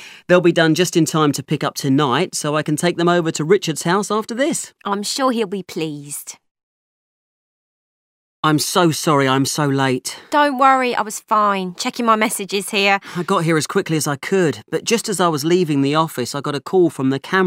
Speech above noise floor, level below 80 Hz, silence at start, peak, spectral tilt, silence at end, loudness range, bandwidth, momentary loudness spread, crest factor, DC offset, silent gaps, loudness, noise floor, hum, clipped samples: over 72 dB; -68 dBFS; 0 s; 0 dBFS; -4.5 dB/octave; 0 s; 7 LU; 16 kHz; 8 LU; 18 dB; under 0.1%; 6.51-6.55 s, 6.63-8.43 s; -18 LUFS; under -90 dBFS; none; under 0.1%